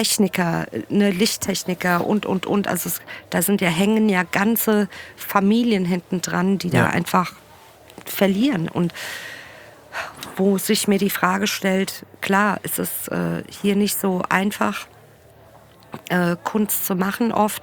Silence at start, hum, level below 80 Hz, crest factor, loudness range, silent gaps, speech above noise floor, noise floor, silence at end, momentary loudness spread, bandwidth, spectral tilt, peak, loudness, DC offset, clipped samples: 0 s; none; -58 dBFS; 20 dB; 4 LU; none; 28 dB; -48 dBFS; 0 s; 12 LU; over 20 kHz; -4.5 dB/octave; -2 dBFS; -21 LUFS; under 0.1%; under 0.1%